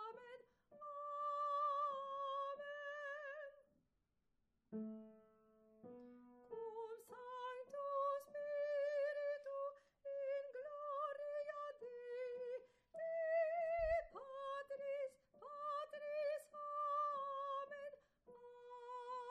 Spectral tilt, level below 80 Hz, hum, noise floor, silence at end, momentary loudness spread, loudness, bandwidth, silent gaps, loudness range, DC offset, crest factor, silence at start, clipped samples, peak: -5 dB/octave; -72 dBFS; none; -86 dBFS; 0 s; 17 LU; -46 LUFS; 13 kHz; none; 10 LU; under 0.1%; 16 dB; 0 s; under 0.1%; -30 dBFS